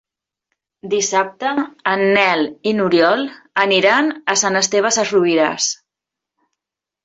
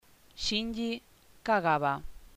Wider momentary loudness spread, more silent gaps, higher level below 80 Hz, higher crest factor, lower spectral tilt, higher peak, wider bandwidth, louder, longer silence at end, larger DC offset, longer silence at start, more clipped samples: second, 7 LU vs 12 LU; neither; second, -64 dBFS vs -52 dBFS; about the same, 16 dB vs 20 dB; second, -2.5 dB/octave vs -4 dB/octave; first, -2 dBFS vs -14 dBFS; second, 8.2 kHz vs 15.5 kHz; first, -16 LUFS vs -31 LUFS; first, 1.3 s vs 0.1 s; neither; first, 0.85 s vs 0.35 s; neither